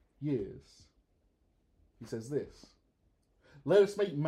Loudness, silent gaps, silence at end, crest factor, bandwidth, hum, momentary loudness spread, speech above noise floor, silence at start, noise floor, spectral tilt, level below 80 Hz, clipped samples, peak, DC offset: -32 LUFS; none; 0 s; 20 dB; 12 kHz; none; 22 LU; 41 dB; 0.2 s; -73 dBFS; -7 dB/octave; -66 dBFS; under 0.1%; -14 dBFS; under 0.1%